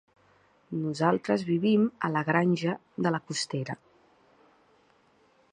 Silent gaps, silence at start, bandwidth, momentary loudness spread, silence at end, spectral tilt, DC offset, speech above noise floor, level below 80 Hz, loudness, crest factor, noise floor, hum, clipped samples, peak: none; 0.7 s; 11 kHz; 10 LU; 1.75 s; -6 dB/octave; under 0.1%; 37 dB; -74 dBFS; -28 LUFS; 22 dB; -64 dBFS; none; under 0.1%; -8 dBFS